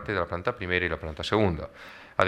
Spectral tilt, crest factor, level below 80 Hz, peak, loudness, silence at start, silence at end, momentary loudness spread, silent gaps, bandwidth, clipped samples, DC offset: -6 dB/octave; 22 dB; -46 dBFS; -6 dBFS; -28 LUFS; 0 s; 0 s; 12 LU; none; 12.5 kHz; under 0.1%; under 0.1%